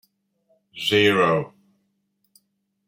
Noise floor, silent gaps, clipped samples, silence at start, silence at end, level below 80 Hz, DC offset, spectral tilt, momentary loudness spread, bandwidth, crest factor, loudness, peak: -72 dBFS; none; under 0.1%; 0.75 s; 1.4 s; -66 dBFS; under 0.1%; -5 dB/octave; 11 LU; 16 kHz; 20 dB; -20 LUFS; -4 dBFS